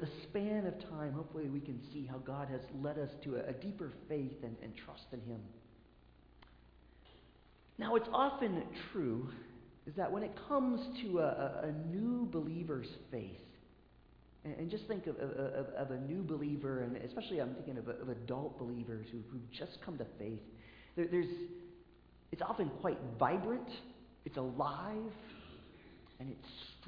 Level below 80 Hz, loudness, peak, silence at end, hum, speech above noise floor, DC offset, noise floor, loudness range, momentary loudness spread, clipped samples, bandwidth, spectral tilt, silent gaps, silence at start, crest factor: -66 dBFS; -41 LUFS; -18 dBFS; 0 s; none; 24 dB; under 0.1%; -65 dBFS; 7 LU; 16 LU; under 0.1%; 5.2 kHz; -6 dB/octave; none; 0 s; 22 dB